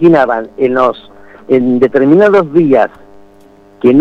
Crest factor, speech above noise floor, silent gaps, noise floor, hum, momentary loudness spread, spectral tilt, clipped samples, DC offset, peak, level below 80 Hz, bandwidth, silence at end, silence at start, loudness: 10 dB; 32 dB; none; -41 dBFS; 50 Hz at -45 dBFS; 7 LU; -8.5 dB/octave; under 0.1%; under 0.1%; 0 dBFS; -50 dBFS; 6.8 kHz; 0 s; 0 s; -10 LUFS